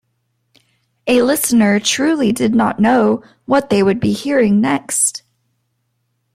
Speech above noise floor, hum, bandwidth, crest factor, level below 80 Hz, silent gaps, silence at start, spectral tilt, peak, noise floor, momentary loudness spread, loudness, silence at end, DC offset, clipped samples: 54 dB; none; 16 kHz; 14 dB; -54 dBFS; none; 1.05 s; -4 dB/octave; -2 dBFS; -68 dBFS; 5 LU; -14 LUFS; 1.15 s; under 0.1%; under 0.1%